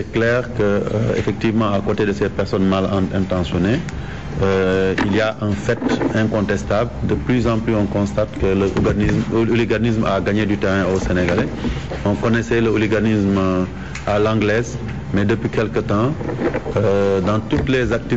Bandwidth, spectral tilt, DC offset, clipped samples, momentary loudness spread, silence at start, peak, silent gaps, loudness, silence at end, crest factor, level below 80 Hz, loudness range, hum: 8 kHz; -7 dB/octave; 1%; under 0.1%; 5 LU; 0 s; -8 dBFS; none; -19 LUFS; 0 s; 10 dB; -34 dBFS; 1 LU; none